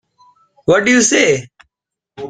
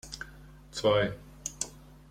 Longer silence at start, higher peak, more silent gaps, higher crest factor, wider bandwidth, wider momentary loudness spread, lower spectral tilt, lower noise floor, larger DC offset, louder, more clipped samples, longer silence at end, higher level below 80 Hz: first, 0.65 s vs 0.05 s; first, 0 dBFS vs -14 dBFS; neither; about the same, 16 dB vs 20 dB; second, 9.6 kHz vs 16 kHz; second, 10 LU vs 16 LU; about the same, -3 dB/octave vs -3.5 dB/octave; first, -81 dBFS vs -51 dBFS; neither; first, -13 LUFS vs -31 LUFS; neither; second, 0 s vs 0.15 s; about the same, -54 dBFS vs -54 dBFS